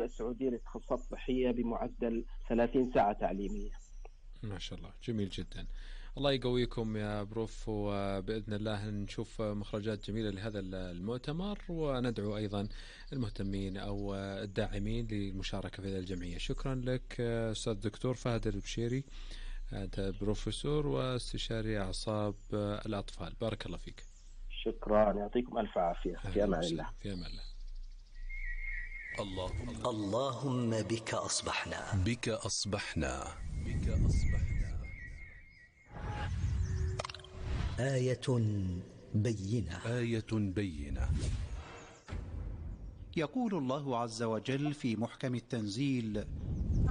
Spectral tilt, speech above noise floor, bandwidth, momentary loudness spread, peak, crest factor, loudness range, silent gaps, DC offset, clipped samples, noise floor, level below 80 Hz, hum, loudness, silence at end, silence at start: -6 dB/octave; 23 dB; 10.5 kHz; 13 LU; -18 dBFS; 18 dB; 4 LU; none; under 0.1%; under 0.1%; -58 dBFS; -44 dBFS; none; -37 LUFS; 0 s; 0 s